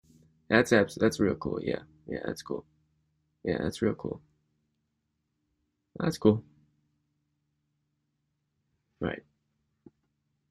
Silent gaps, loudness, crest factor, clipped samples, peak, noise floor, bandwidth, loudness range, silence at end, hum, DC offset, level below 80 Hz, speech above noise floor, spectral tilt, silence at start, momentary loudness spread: none; -30 LUFS; 24 dB; under 0.1%; -8 dBFS; -80 dBFS; 14 kHz; 15 LU; 1.3 s; none; under 0.1%; -62 dBFS; 52 dB; -6 dB/octave; 0.5 s; 15 LU